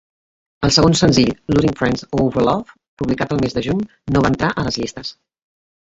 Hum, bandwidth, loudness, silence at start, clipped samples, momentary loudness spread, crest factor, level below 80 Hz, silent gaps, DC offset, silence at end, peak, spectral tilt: none; 8.2 kHz; -17 LUFS; 0.6 s; under 0.1%; 11 LU; 16 dB; -38 dBFS; 2.88-2.97 s; under 0.1%; 0.75 s; -2 dBFS; -5 dB/octave